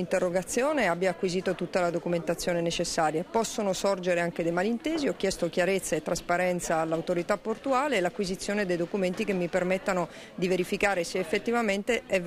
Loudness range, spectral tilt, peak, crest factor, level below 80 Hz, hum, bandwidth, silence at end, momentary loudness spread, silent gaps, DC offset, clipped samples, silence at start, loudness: 1 LU; -4.5 dB/octave; -12 dBFS; 16 dB; -54 dBFS; none; 15.5 kHz; 0 s; 3 LU; none; under 0.1%; under 0.1%; 0 s; -28 LUFS